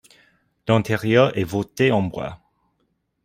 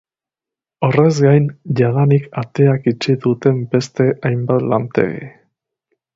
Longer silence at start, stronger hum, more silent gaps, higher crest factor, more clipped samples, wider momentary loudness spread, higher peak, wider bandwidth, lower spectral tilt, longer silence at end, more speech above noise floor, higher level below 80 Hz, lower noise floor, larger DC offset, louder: second, 0.65 s vs 0.8 s; neither; neither; about the same, 20 dB vs 16 dB; neither; first, 15 LU vs 7 LU; about the same, -2 dBFS vs 0 dBFS; first, 16 kHz vs 7.8 kHz; second, -6.5 dB/octave vs -8 dB/octave; about the same, 0.9 s vs 0.85 s; second, 51 dB vs 73 dB; about the same, -54 dBFS vs -52 dBFS; second, -70 dBFS vs -88 dBFS; neither; second, -20 LUFS vs -16 LUFS